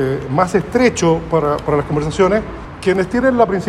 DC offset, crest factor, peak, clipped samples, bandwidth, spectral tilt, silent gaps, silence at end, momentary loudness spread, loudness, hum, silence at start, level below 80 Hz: under 0.1%; 16 dB; 0 dBFS; under 0.1%; 12.5 kHz; -6 dB/octave; none; 0 s; 6 LU; -16 LUFS; none; 0 s; -36 dBFS